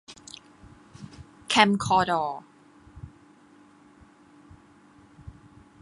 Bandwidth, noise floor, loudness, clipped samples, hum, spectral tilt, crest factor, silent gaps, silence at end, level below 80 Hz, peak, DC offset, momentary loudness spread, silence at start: 11.5 kHz; -55 dBFS; -23 LUFS; under 0.1%; none; -4 dB/octave; 28 dB; none; 0.5 s; -56 dBFS; -2 dBFS; under 0.1%; 28 LU; 0.1 s